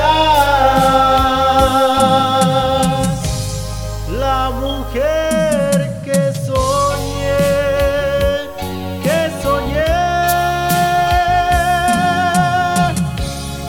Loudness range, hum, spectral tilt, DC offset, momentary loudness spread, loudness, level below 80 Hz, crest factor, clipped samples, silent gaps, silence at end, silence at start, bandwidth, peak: 4 LU; none; -5 dB/octave; under 0.1%; 9 LU; -15 LUFS; -28 dBFS; 14 dB; under 0.1%; none; 0 s; 0 s; 18 kHz; 0 dBFS